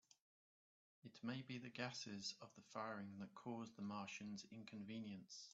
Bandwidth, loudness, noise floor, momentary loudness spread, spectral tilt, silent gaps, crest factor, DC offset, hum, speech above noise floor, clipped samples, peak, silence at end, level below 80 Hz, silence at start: 8 kHz; -52 LUFS; under -90 dBFS; 7 LU; -4 dB/octave; none; 22 dB; under 0.1%; none; over 38 dB; under 0.1%; -32 dBFS; 0 s; under -90 dBFS; 1.05 s